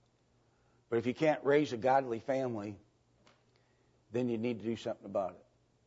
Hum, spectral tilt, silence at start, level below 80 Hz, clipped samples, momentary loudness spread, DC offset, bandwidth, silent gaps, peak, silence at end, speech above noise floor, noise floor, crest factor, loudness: none; -6.5 dB/octave; 0.9 s; -76 dBFS; under 0.1%; 10 LU; under 0.1%; 8 kHz; none; -18 dBFS; 0.5 s; 38 dB; -71 dBFS; 18 dB; -34 LUFS